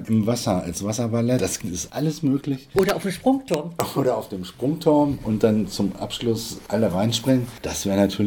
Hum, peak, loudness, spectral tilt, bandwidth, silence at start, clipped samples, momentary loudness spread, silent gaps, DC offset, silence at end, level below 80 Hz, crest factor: none; -4 dBFS; -23 LUFS; -5.5 dB/octave; 18 kHz; 0 s; under 0.1%; 7 LU; none; under 0.1%; 0 s; -48 dBFS; 18 dB